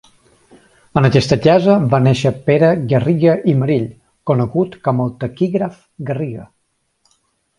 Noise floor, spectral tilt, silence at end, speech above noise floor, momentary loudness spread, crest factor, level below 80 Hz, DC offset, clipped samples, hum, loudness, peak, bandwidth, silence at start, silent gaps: -67 dBFS; -7.5 dB/octave; 1.15 s; 52 dB; 13 LU; 16 dB; -48 dBFS; under 0.1%; under 0.1%; none; -15 LUFS; 0 dBFS; 11 kHz; 0.95 s; none